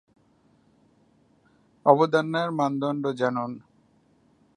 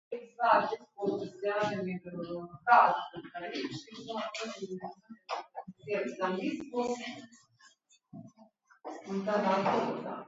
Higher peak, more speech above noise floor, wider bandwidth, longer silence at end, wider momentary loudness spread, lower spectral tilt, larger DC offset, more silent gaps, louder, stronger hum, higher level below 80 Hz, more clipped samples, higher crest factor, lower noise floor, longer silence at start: first, -2 dBFS vs -8 dBFS; first, 39 dB vs 32 dB; first, 10.5 kHz vs 7.6 kHz; first, 1 s vs 0 s; second, 12 LU vs 20 LU; first, -7 dB/octave vs -3.5 dB/octave; neither; neither; first, -24 LUFS vs -32 LUFS; neither; about the same, -76 dBFS vs -78 dBFS; neither; about the same, 24 dB vs 26 dB; about the same, -63 dBFS vs -64 dBFS; first, 1.85 s vs 0.1 s